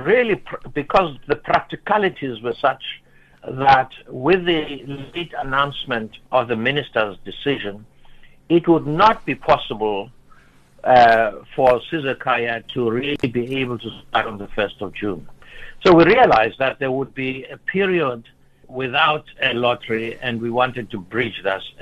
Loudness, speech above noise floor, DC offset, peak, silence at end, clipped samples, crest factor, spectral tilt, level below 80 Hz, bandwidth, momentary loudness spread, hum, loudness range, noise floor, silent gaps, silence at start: -19 LUFS; 30 dB; under 0.1%; -2 dBFS; 0 s; under 0.1%; 18 dB; -7 dB/octave; -46 dBFS; 9.6 kHz; 14 LU; none; 5 LU; -49 dBFS; none; 0 s